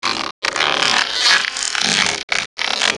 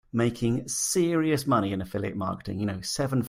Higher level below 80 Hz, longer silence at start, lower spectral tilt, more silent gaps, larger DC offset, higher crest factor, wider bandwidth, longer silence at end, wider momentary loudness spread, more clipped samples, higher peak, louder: about the same, -54 dBFS vs -54 dBFS; about the same, 0.05 s vs 0.15 s; second, 0 dB/octave vs -5 dB/octave; first, 0.31-0.42 s, 2.23-2.28 s, 2.46-2.57 s vs none; neither; about the same, 18 dB vs 16 dB; second, 12.5 kHz vs 16 kHz; about the same, 0 s vs 0 s; about the same, 7 LU vs 7 LU; neither; first, 0 dBFS vs -10 dBFS; first, -16 LUFS vs -27 LUFS